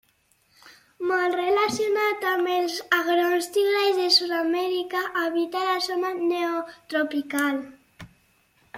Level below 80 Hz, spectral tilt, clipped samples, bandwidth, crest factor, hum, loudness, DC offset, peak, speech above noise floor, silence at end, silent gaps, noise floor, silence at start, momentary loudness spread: -68 dBFS; -2.5 dB/octave; under 0.1%; 16.5 kHz; 20 dB; none; -24 LUFS; under 0.1%; -6 dBFS; 41 dB; 0 s; none; -65 dBFS; 0.65 s; 7 LU